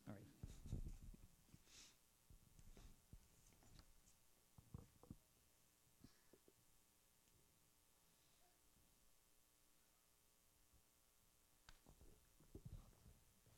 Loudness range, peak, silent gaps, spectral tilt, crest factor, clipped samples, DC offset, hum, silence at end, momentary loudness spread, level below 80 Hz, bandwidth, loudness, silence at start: 7 LU; -38 dBFS; none; -5 dB/octave; 26 dB; under 0.1%; under 0.1%; none; 0 s; 12 LU; -68 dBFS; 16 kHz; -62 LUFS; 0 s